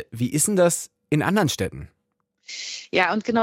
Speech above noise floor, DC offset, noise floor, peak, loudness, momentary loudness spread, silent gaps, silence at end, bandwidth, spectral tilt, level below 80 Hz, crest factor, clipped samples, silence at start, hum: 50 dB; under 0.1%; -72 dBFS; -6 dBFS; -22 LUFS; 13 LU; none; 0 s; 16 kHz; -4 dB/octave; -56 dBFS; 18 dB; under 0.1%; 0 s; none